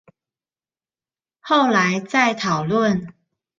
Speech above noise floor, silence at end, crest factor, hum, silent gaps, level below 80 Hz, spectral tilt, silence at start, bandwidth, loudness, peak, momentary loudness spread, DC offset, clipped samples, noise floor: over 72 dB; 0.5 s; 18 dB; none; none; -60 dBFS; -5 dB/octave; 1.45 s; 7.6 kHz; -19 LUFS; -2 dBFS; 5 LU; under 0.1%; under 0.1%; under -90 dBFS